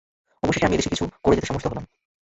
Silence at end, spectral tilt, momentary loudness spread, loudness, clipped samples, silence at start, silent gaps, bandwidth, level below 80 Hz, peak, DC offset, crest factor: 0.5 s; -5 dB/octave; 8 LU; -23 LUFS; under 0.1%; 0.45 s; none; 8.2 kHz; -40 dBFS; -4 dBFS; under 0.1%; 20 dB